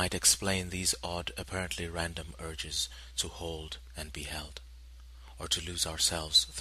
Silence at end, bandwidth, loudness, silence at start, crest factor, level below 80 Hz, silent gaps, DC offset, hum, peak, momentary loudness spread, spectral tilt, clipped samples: 0 s; 14 kHz; -31 LUFS; 0 s; 26 dB; -48 dBFS; none; under 0.1%; none; -8 dBFS; 17 LU; -1.5 dB/octave; under 0.1%